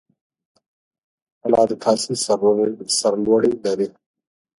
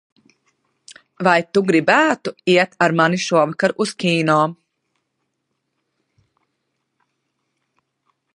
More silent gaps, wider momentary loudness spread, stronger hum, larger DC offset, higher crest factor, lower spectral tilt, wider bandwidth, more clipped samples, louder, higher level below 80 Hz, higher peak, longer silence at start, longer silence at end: neither; about the same, 6 LU vs 5 LU; neither; neither; about the same, 18 dB vs 20 dB; about the same, -4 dB/octave vs -5 dB/octave; about the same, 11.5 kHz vs 11.5 kHz; neither; about the same, -19 LUFS vs -17 LUFS; first, -60 dBFS vs -68 dBFS; about the same, -2 dBFS vs 0 dBFS; first, 1.45 s vs 0.9 s; second, 0.7 s vs 3.8 s